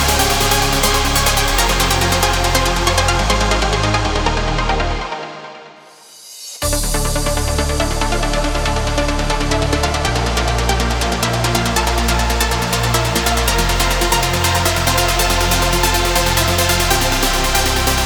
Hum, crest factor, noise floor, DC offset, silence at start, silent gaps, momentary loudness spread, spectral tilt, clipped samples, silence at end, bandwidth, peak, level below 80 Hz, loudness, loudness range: none; 16 dB; -41 dBFS; under 0.1%; 0 s; none; 4 LU; -3 dB/octave; under 0.1%; 0 s; over 20 kHz; 0 dBFS; -22 dBFS; -15 LUFS; 6 LU